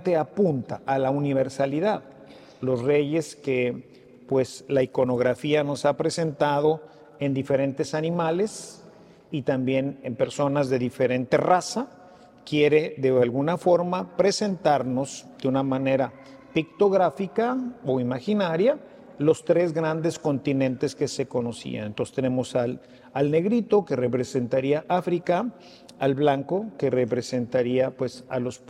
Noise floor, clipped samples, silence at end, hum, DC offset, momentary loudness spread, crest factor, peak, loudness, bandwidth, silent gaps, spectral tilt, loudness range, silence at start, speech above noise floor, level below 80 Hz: -50 dBFS; under 0.1%; 0.1 s; none; under 0.1%; 8 LU; 18 dB; -6 dBFS; -25 LUFS; 12.5 kHz; none; -6 dB/octave; 3 LU; 0 s; 26 dB; -66 dBFS